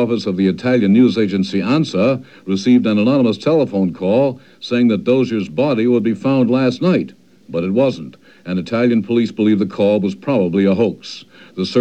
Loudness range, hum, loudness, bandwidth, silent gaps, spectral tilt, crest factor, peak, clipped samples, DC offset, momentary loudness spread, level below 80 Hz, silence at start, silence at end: 3 LU; none; -16 LUFS; 8.6 kHz; none; -7.5 dB/octave; 14 dB; -2 dBFS; under 0.1%; 0.2%; 10 LU; -60 dBFS; 0 s; 0 s